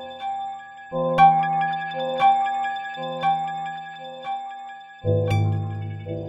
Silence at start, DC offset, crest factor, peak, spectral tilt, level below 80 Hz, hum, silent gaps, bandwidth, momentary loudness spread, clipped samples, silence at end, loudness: 0 s; under 0.1%; 18 dB; -4 dBFS; -7 dB/octave; -56 dBFS; none; none; 8 kHz; 18 LU; under 0.1%; 0 s; -23 LUFS